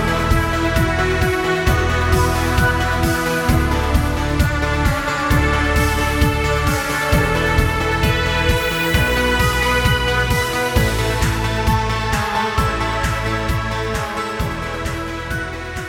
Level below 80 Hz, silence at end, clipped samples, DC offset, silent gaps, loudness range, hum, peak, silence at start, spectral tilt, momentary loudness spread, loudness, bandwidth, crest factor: -24 dBFS; 0 s; under 0.1%; under 0.1%; none; 3 LU; none; 0 dBFS; 0 s; -5 dB/octave; 6 LU; -18 LUFS; 19 kHz; 16 dB